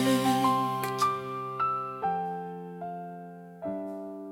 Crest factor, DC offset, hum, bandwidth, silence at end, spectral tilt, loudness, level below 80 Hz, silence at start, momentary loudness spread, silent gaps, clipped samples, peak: 16 dB; under 0.1%; none; 17.5 kHz; 0 s; -5 dB/octave; -30 LUFS; -70 dBFS; 0 s; 15 LU; none; under 0.1%; -14 dBFS